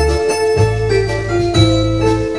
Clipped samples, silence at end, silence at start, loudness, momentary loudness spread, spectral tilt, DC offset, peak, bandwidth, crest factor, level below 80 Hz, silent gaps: under 0.1%; 0 s; 0 s; -14 LUFS; 4 LU; -6 dB/octave; 0.7%; 0 dBFS; 11 kHz; 14 dB; -24 dBFS; none